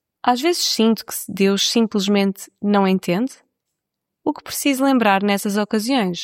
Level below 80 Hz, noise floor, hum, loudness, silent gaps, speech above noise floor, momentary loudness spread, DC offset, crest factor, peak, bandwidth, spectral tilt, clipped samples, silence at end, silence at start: -66 dBFS; -80 dBFS; none; -19 LUFS; none; 62 dB; 10 LU; under 0.1%; 16 dB; -2 dBFS; 16.5 kHz; -4 dB/octave; under 0.1%; 0 s; 0.25 s